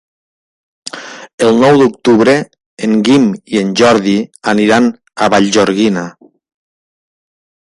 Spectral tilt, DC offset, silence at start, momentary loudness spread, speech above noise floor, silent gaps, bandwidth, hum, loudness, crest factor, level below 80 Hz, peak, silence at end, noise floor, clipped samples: -5 dB/octave; under 0.1%; 0.85 s; 18 LU; over 80 dB; 1.33-1.38 s, 2.66-2.77 s; 11.5 kHz; none; -11 LUFS; 12 dB; -52 dBFS; 0 dBFS; 1.65 s; under -90 dBFS; under 0.1%